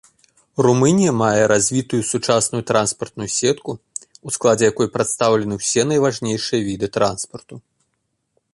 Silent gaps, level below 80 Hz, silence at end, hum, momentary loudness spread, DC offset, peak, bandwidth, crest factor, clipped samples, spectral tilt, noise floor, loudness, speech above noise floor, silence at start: none; -54 dBFS; 0.95 s; none; 14 LU; under 0.1%; -2 dBFS; 11.5 kHz; 18 dB; under 0.1%; -4.5 dB/octave; -72 dBFS; -18 LUFS; 54 dB; 0.6 s